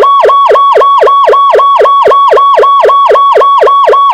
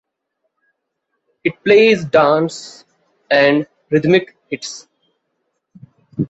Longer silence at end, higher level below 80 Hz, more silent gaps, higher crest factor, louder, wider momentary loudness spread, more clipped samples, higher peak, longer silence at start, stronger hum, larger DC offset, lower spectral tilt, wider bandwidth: about the same, 0 s vs 0.05 s; first, -48 dBFS vs -58 dBFS; neither; second, 4 dB vs 16 dB; first, -4 LUFS vs -15 LUFS; second, 0 LU vs 19 LU; first, 6% vs under 0.1%; about the same, 0 dBFS vs -2 dBFS; second, 0 s vs 1.45 s; neither; neither; second, -3 dB/octave vs -5.5 dB/octave; first, 9.2 kHz vs 8.2 kHz